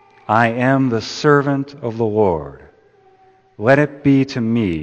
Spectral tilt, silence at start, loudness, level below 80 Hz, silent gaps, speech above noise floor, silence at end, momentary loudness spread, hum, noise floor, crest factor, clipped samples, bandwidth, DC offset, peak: -7 dB/octave; 0.3 s; -17 LUFS; -50 dBFS; none; 36 dB; 0 s; 7 LU; none; -52 dBFS; 18 dB; under 0.1%; 8.2 kHz; under 0.1%; 0 dBFS